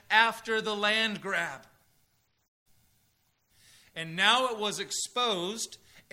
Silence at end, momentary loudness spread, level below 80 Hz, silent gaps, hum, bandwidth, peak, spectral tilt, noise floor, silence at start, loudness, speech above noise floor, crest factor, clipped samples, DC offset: 0.1 s; 14 LU; -76 dBFS; 2.48-2.66 s; none; 16 kHz; -6 dBFS; -1.5 dB/octave; -72 dBFS; 0.1 s; -28 LUFS; 43 dB; 24 dB; under 0.1%; under 0.1%